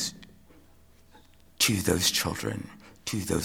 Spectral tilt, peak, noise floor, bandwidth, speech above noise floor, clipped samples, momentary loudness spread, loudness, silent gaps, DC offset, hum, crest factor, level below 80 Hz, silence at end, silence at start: -3 dB/octave; -6 dBFS; -56 dBFS; over 20 kHz; 28 dB; under 0.1%; 15 LU; -27 LUFS; none; under 0.1%; none; 24 dB; -52 dBFS; 0 s; 0 s